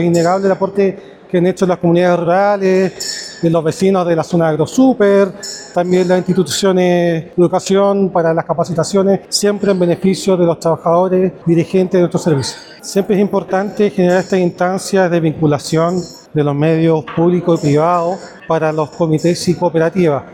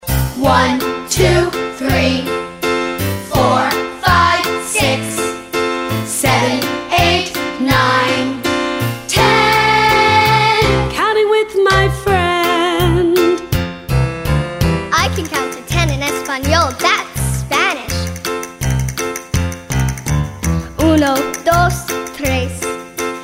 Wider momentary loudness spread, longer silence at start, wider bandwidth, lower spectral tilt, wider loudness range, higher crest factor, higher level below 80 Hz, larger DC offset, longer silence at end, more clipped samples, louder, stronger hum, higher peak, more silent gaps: second, 5 LU vs 9 LU; about the same, 0 s vs 0.05 s; about the same, 15.5 kHz vs 16.5 kHz; first, -6 dB/octave vs -4.5 dB/octave; second, 1 LU vs 5 LU; about the same, 12 dB vs 14 dB; second, -52 dBFS vs -28 dBFS; neither; about the same, 0 s vs 0 s; neither; about the same, -14 LUFS vs -15 LUFS; neither; about the same, -2 dBFS vs 0 dBFS; neither